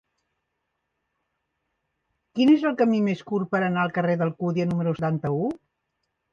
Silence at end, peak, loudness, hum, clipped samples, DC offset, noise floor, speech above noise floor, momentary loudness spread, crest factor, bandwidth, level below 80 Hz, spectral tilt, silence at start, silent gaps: 0.75 s; -8 dBFS; -24 LUFS; none; under 0.1%; under 0.1%; -79 dBFS; 56 dB; 8 LU; 18 dB; 7.2 kHz; -64 dBFS; -8.5 dB/octave; 2.35 s; none